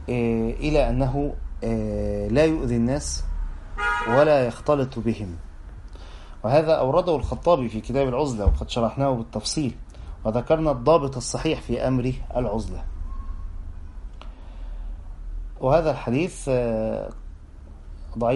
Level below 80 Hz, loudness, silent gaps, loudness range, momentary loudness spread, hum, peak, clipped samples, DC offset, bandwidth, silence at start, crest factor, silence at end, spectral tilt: -32 dBFS; -23 LUFS; none; 6 LU; 21 LU; none; -6 dBFS; under 0.1%; under 0.1%; 11.5 kHz; 0 s; 18 dB; 0 s; -6 dB/octave